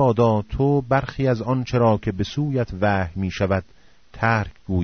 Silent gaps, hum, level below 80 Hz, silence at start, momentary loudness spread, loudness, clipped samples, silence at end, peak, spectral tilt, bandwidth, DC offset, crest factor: none; none; -40 dBFS; 0 s; 6 LU; -22 LUFS; under 0.1%; 0 s; -6 dBFS; -6.5 dB/octave; 6.6 kHz; 0.3%; 16 dB